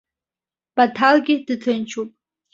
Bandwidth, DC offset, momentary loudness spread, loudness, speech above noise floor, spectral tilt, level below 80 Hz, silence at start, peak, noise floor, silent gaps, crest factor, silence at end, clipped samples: 7.8 kHz; under 0.1%; 14 LU; -19 LUFS; over 72 dB; -4.5 dB/octave; -68 dBFS; 0.75 s; -2 dBFS; under -90 dBFS; none; 20 dB; 0.45 s; under 0.1%